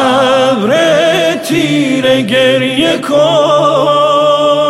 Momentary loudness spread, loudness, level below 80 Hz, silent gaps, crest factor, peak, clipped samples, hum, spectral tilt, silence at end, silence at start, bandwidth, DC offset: 3 LU; -9 LUFS; -50 dBFS; none; 8 dB; 0 dBFS; under 0.1%; none; -4.5 dB/octave; 0 s; 0 s; 15.5 kHz; under 0.1%